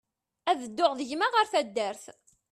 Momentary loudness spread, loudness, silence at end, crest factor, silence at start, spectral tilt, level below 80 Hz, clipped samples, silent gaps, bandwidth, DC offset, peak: 10 LU; -28 LUFS; 0.4 s; 18 dB; 0.45 s; -2.5 dB/octave; -76 dBFS; under 0.1%; none; 13.5 kHz; under 0.1%; -10 dBFS